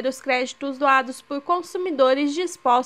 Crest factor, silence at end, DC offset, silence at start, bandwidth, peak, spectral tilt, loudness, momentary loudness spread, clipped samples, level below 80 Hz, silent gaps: 18 dB; 0 s; under 0.1%; 0 s; 14 kHz; -4 dBFS; -2 dB/octave; -22 LUFS; 9 LU; under 0.1%; -72 dBFS; none